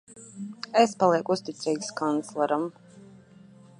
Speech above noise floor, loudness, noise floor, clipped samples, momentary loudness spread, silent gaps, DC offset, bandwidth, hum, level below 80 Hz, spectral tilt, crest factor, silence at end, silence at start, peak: 27 dB; -26 LUFS; -52 dBFS; under 0.1%; 17 LU; none; under 0.1%; 11 kHz; none; -76 dBFS; -4.5 dB/octave; 22 dB; 0.75 s; 0.1 s; -6 dBFS